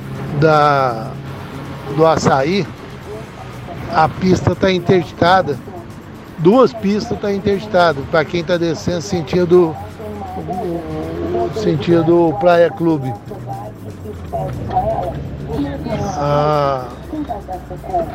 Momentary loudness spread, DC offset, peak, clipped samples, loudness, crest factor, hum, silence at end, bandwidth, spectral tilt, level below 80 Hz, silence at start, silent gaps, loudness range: 17 LU; under 0.1%; 0 dBFS; under 0.1%; -16 LUFS; 16 dB; none; 0 s; 15.5 kHz; -6.5 dB/octave; -38 dBFS; 0 s; none; 4 LU